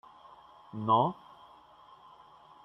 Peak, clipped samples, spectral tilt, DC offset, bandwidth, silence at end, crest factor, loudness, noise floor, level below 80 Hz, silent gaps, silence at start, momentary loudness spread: -12 dBFS; under 0.1%; -9 dB/octave; under 0.1%; 5.8 kHz; 1.5 s; 22 dB; -29 LUFS; -57 dBFS; -74 dBFS; none; 0.75 s; 27 LU